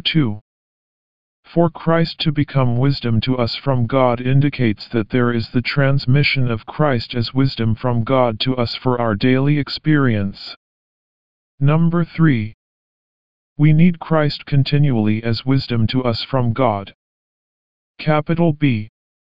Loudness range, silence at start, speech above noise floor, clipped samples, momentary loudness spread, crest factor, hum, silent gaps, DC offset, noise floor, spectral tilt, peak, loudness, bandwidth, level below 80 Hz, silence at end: 3 LU; 0 s; over 73 dB; under 0.1%; 6 LU; 16 dB; none; 0.41-1.43 s, 10.56-11.58 s, 12.54-13.56 s, 16.94-17.95 s; 3%; under -90 dBFS; -6 dB/octave; -2 dBFS; -18 LUFS; 5.4 kHz; -44 dBFS; 0.3 s